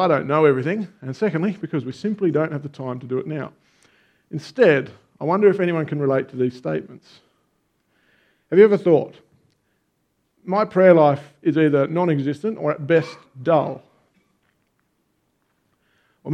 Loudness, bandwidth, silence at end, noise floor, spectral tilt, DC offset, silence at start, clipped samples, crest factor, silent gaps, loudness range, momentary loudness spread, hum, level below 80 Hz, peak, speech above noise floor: -20 LUFS; 9 kHz; 0 s; -70 dBFS; -8.5 dB/octave; under 0.1%; 0 s; under 0.1%; 22 dB; none; 7 LU; 16 LU; none; -70 dBFS; 0 dBFS; 51 dB